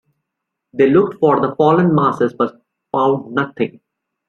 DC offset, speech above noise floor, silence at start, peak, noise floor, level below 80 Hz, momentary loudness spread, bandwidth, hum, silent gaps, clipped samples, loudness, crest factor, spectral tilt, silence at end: under 0.1%; 64 dB; 0.75 s; -2 dBFS; -79 dBFS; -58 dBFS; 10 LU; 6.8 kHz; none; none; under 0.1%; -16 LUFS; 16 dB; -9 dB/octave; 0.6 s